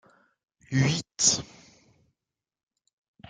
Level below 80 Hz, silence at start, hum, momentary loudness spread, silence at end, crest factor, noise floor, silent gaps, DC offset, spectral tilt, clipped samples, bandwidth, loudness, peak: -62 dBFS; 0.7 s; none; 8 LU; 1.85 s; 24 dB; -89 dBFS; none; under 0.1%; -3 dB/octave; under 0.1%; 10 kHz; -25 LUFS; -8 dBFS